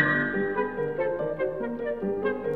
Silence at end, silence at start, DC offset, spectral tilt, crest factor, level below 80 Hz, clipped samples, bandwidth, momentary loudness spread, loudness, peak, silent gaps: 0 s; 0 s; 0.2%; -8.5 dB/octave; 18 dB; -56 dBFS; under 0.1%; 4.7 kHz; 5 LU; -28 LUFS; -10 dBFS; none